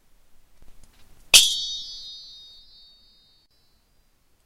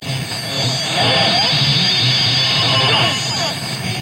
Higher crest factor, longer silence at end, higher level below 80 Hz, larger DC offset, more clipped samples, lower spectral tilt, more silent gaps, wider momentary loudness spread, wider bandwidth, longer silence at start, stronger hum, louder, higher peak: first, 28 dB vs 14 dB; first, 2.25 s vs 0 s; about the same, -52 dBFS vs -48 dBFS; neither; neither; second, 3 dB/octave vs -3 dB/octave; neither; first, 26 LU vs 9 LU; about the same, 16 kHz vs 16 kHz; first, 0.65 s vs 0 s; neither; second, -17 LUFS vs -14 LUFS; about the same, 0 dBFS vs -2 dBFS